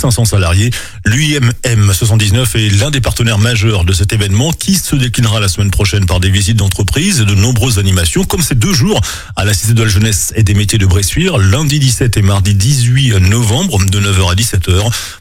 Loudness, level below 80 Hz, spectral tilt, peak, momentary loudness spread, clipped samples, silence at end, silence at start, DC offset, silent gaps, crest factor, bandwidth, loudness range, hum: -11 LUFS; -24 dBFS; -4.5 dB/octave; 0 dBFS; 2 LU; under 0.1%; 0.05 s; 0 s; under 0.1%; none; 10 dB; 16.5 kHz; 1 LU; none